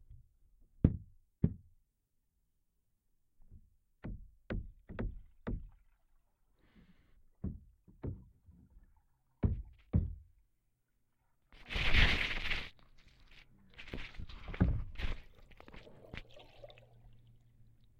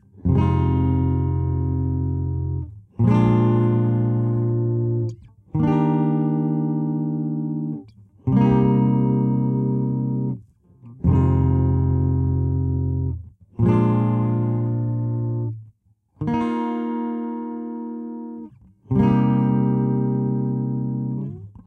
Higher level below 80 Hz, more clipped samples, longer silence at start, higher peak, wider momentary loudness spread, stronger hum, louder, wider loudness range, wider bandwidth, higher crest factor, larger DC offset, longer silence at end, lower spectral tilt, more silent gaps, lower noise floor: second, -44 dBFS vs -38 dBFS; neither; about the same, 0.1 s vs 0.15 s; second, -12 dBFS vs -6 dBFS; first, 23 LU vs 12 LU; neither; second, -38 LUFS vs -21 LUFS; first, 16 LU vs 4 LU; first, 9 kHz vs 3.7 kHz; first, 28 dB vs 16 dB; neither; first, 1.3 s vs 0.15 s; second, -6 dB/octave vs -11.5 dB/octave; neither; first, -80 dBFS vs -60 dBFS